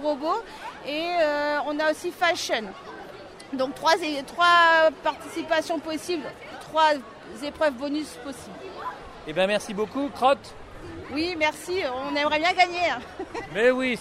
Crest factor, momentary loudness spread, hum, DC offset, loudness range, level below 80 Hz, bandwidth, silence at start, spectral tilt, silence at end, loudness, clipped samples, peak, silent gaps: 18 dB; 18 LU; none; under 0.1%; 6 LU; -56 dBFS; 15.5 kHz; 0 s; -3 dB/octave; 0 s; -24 LUFS; under 0.1%; -6 dBFS; none